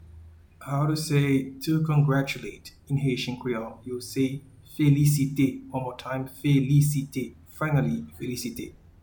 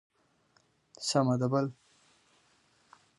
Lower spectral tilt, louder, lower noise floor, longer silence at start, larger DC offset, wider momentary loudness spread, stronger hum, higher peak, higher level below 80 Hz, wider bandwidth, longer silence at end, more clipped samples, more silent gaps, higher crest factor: about the same, -6.5 dB/octave vs -5.5 dB/octave; first, -26 LUFS vs -30 LUFS; second, -49 dBFS vs -70 dBFS; second, 0 s vs 1 s; neither; first, 14 LU vs 10 LU; neither; about the same, -10 dBFS vs -12 dBFS; first, -54 dBFS vs -76 dBFS; first, 19 kHz vs 11.5 kHz; second, 0.3 s vs 1.45 s; neither; neither; second, 16 dB vs 22 dB